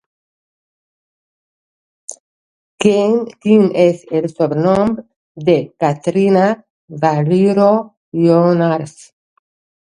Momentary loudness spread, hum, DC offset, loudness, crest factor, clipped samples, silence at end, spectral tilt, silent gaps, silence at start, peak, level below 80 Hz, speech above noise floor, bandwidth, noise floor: 14 LU; none; under 0.1%; -14 LUFS; 16 dB; under 0.1%; 1 s; -7 dB/octave; 2.20-2.78 s, 5.16-5.35 s, 6.70-6.88 s, 7.97-8.12 s; 2.1 s; 0 dBFS; -56 dBFS; over 77 dB; 11 kHz; under -90 dBFS